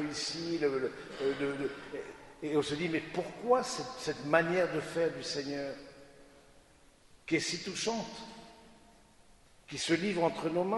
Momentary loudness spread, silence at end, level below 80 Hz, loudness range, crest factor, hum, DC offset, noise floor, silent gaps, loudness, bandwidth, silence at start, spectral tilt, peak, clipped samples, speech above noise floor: 14 LU; 0 s; -66 dBFS; 6 LU; 24 dB; none; under 0.1%; -62 dBFS; none; -34 LUFS; 11.5 kHz; 0 s; -4 dB/octave; -10 dBFS; under 0.1%; 28 dB